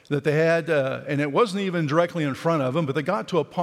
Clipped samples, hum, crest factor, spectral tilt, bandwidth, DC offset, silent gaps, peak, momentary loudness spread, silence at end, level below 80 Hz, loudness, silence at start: under 0.1%; none; 16 dB; -6.5 dB/octave; 13.5 kHz; under 0.1%; none; -6 dBFS; 5 LU; 0 s; -70 dBFS; -23 LUFS; 0.1 s